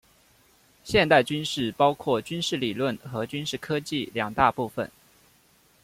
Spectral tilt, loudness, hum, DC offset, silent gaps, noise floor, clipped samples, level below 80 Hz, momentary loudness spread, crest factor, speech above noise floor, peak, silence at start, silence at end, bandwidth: -4.5 dB/octave; -25 LUFS; none; under 0.1%; none; -61 dBFS; under 0.1%; -54 dBFS; 11 LU; 22 dB; 36 dB; -6 dBFS; 0.85 s; 0.95 s; 16.5 kHz